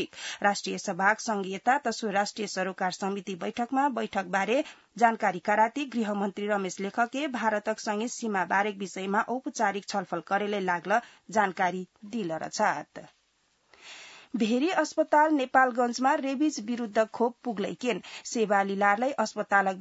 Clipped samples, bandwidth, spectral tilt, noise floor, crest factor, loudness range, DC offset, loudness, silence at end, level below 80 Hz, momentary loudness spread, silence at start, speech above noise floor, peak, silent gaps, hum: under 0.1%; 8 kHz; -4 dB/octave; -70 dBFS; 20 dB; 4 LU; under 0.1%; -28 LUFS; 0 s; -78 dBFS; 9 LU; 0 s; 42 dB; -8 dBFS; none; none